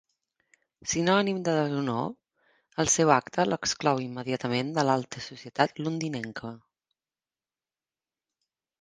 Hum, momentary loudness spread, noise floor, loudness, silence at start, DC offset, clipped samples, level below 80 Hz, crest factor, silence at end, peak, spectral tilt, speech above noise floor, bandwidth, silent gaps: none; 14 LU; under -90 dBFS; -27 LUFS; 0.85 s; under 0.1%; under 0.1%; -64 dBFS; 24 dB; 2.25 s; -6 dBFS; -4 dB/octave; over 63 dB; 10.5 kHz; none